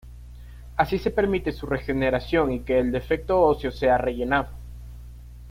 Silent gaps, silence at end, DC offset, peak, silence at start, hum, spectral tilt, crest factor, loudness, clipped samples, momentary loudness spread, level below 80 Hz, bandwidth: none; 0 s; under 0.1%; -6 dBFS; 0.05 s; 60 Hz at -35 dBFS; -7.5 dB/octave; 18 dB; -24 LUFS; under 0.1%; 22 LU; -38 dBFS; 16 kHz